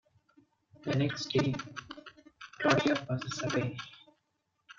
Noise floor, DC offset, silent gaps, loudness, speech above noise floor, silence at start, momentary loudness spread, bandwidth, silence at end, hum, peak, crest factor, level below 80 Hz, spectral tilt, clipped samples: -80 dBFS; under 0.1%; none; -32 LUFS; 49 dB; 0.8 s; 21 LU; 7.6 kHz; 0.05 s; none; -10 dBFS; 24 dB; -66 dBFS; -5.5 dB/octave; under 0.1%